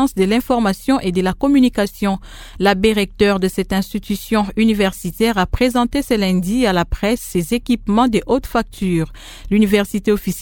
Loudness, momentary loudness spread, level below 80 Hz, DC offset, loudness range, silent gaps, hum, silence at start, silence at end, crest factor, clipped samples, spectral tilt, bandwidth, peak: -17 LUFS; 6 LU; -34 dBFS; under 0.1%; 1 LU; none; none; 0 s; 0 s; 16 dB; under 0.1%; -5.5 dB/octave; 18 kHz; 0 dBFS